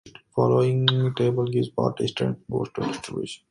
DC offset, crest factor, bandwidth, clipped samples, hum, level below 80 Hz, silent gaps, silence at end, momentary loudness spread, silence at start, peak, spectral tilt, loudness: under 0.1%; 22 dB; 11 kHz; under 0.1%; none; -58 dBFS; none; 0.15 s; 11 LU; 0.05 s; -2 dBFS; -6.5 dB/octave; -24 LUFS